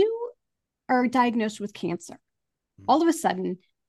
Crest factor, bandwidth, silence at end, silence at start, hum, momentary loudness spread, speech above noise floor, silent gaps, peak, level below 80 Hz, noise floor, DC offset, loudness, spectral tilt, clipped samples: 18 dB; 12.5 kHz; 0.3 s; 0 s; none; 14 LU; 58 dB; none; -8 dBFS; -74 dBFS; -83 dBFS; under 0.1%; -25 LUFS; -5 dB/octave; under 0.1%